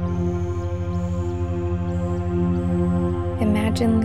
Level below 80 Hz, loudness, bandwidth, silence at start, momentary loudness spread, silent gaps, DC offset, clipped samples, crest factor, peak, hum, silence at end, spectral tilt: -34 dBFS; -23 LUFS; 12 kHz; 0 s; 5 LU; none; 0.9%; under 0.1%; 12 dB; -8 dBFS; none; 0 s; -8 dB/octave